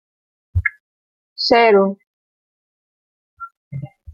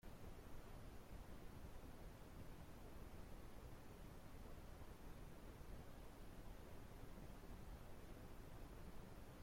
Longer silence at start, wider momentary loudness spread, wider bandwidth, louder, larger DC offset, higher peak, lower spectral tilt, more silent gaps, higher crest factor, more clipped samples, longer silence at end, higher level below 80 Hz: first, 0.55 s vs 0.05 s; first, 25 LU vs 1 LU; second, 7.2 kHz vs 16.5 kHz; first, -16 LUFS vs -61 LUFS; neither; first, -2 dBFS vs -44 dBFS; about the same, -6 dB/octave vs -5.5 dB/octave; first, 0.80-1.36 s, 2.06-3.37 s, 3.57-3.71 s vs none; first, 20 dB vs 12 dB; neither; about the same, 0 s vs 0 s; first, -42 dBFS vs -60 dBFS